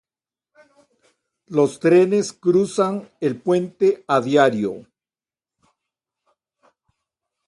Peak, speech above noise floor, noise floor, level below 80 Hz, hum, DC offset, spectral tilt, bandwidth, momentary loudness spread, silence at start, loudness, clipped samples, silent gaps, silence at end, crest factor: -2 dBFS; over 72 dB; under -90 dBFS; -66 dBFS; none; under 0.1%; -6 dB/octave; 11.5 kHz; 10 LU; 1.5 s; -19 LUFS; under 0.1%; none; 2.65 s; 20 dB